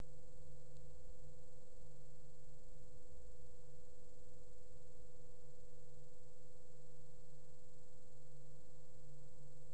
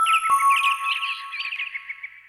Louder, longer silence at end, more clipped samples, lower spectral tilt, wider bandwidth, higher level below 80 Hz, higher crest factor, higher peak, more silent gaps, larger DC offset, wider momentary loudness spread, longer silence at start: second, -65 LUFS vs -21 LUFS; about the same, 0 s vs 0.1 s; neither; first, -6 dB/octave vs 3.5 dB/octave; second, 10 kHz vs 14 kHz; first, -66 dBFS vs -72 dBFS; first, 22 dB vs 14 dB; second, -34 dBFS vs -10 dBFS; neither; first, 1% vs under 0.1%; second, 3 LU vs 13 LU; about the same, 0 s vs 0 s